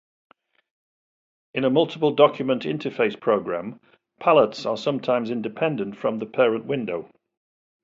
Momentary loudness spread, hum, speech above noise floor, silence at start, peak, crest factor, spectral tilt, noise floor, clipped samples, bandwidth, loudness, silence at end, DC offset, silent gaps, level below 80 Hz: 11 LU; none; over 68 dB; 1.55 s; -2 dBFS; 22 dB; -6.5 dB/octave; under -90 dBFS; under 0.1%; 7.6 kHz; -23 LUFS; 0.75 s; under 0.1%; none; -70 dBFS